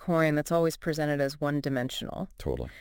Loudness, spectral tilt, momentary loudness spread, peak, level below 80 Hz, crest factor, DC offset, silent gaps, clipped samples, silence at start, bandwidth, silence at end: -29 LUFS; -6 dB/octave; 9 LU; -12 dBFS; -48 dBFS; 18 dB; under 0.1%; none; under 0.1%; 0 s; 17 kHz; 0 s